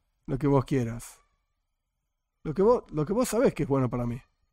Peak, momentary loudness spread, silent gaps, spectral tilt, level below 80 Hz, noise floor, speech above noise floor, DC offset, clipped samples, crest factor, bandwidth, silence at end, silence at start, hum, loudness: -12 dBFS; 16 LU; none; -7 dB/octave; -48 dBFS; -81 dBFS; 55 dB; under 0.1%; under 0.1%; 18 dB; 16 kHz; 0.3 s; 0.3 s; none; -27 LUFS